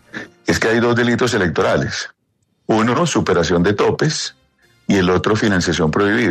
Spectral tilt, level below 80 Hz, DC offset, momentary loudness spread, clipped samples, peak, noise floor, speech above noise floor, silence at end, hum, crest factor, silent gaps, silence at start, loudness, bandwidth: -5 dB/octave; -44 dBFS; under 0.1%; 11 LU; under 0.1%; -2 dBFS; -65 dBFS; 50 dB; 0 s; none; 14 dB; none; 0.15 s; -16 LUFS; 13.5 kHz